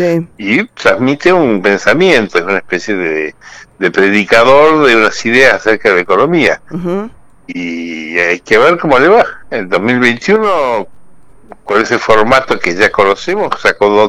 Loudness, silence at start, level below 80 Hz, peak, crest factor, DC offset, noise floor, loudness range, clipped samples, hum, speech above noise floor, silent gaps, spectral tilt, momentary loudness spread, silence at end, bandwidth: -10 LUFS; 0 s; -44 dBFS; 0 dBFS; 10 dB; under 0.1%; -43 dBFS; 3 LU; 0.7%; none; 33 dB; none; -5 dB/octave; 11 LU; 0 s; 13.5 kHz